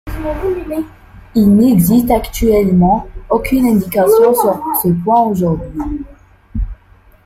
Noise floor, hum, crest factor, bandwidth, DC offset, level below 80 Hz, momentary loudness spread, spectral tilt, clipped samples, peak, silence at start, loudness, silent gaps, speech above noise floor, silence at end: -45 dBFS; none; 12 dB; 16.5 kHz; under 0.1%; -30 dBFS; 15 LU; -7 dB/octave; under 0.1%; -2 dBFS; 0.05 s; -13 LUFS; none; 33 dB; 0.5 s